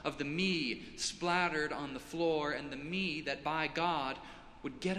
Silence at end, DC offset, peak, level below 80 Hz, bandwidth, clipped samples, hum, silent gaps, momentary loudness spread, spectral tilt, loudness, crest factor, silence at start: 0 s; under 0.1%; -16 dBFS; -62 dBFS; 14 kHz; under 0.1%; none; none; 9 LU; -4 dB/octave; -35 LUFS; 20 dB; 0 s